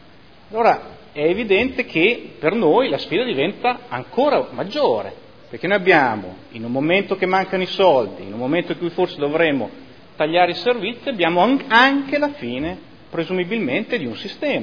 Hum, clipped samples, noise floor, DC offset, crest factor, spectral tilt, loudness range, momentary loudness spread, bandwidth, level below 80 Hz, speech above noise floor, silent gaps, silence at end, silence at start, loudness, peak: none; under 0.1%; -47 dBFS; 0.4%; 20 dB; -6.5 dB/octave; 2 LU; 12 LU; 5.4 kHz; -54 dBFS; 29 dB; none; 0 s; 0.5 s; -19 LUFS; 0 dBFS